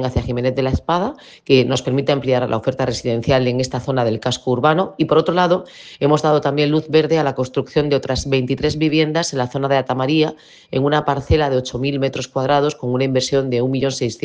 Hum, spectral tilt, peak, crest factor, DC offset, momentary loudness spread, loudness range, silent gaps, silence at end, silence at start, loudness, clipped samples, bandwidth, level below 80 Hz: none; -6 dB/octave; 0 dBFS; 18 dB; under 0.1%; 6 LU; 2 LU; none; 0.05 s; 0 s; -18 LUFS; under 0.1%; 9.8 kHz; -40 dBFS